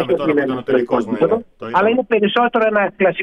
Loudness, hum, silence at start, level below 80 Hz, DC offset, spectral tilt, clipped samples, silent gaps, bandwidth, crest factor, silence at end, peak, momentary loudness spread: -17 LUFS; none; 0 s; -54 dBFS; under 0.1%; -7 dB/octave; under 0.1%; none; 7.6 kHz; 12 dB; 0 s; -4 dBFS; 4 LU